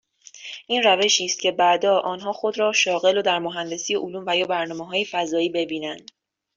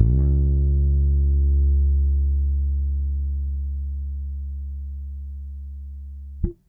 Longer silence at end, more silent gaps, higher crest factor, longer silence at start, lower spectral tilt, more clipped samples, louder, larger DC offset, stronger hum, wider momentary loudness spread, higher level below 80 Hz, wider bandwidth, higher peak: first, 0.55 s vs 0.15 s; neither; about the same, 18 dB vs 16 dB; first, 0.35 s vs 0 s; second, -2 dB/octave vs -14 dB/octave; neither; about the same, -21 LUFS vs -23 LUFS; neither; neither; second, 11 LU vs 16 LU; second, -70 dBFS vs -22 dBFS; first, 7.8 kHz vs 0.9 kHz; about the same, -4 dBFS vs -6 dBFS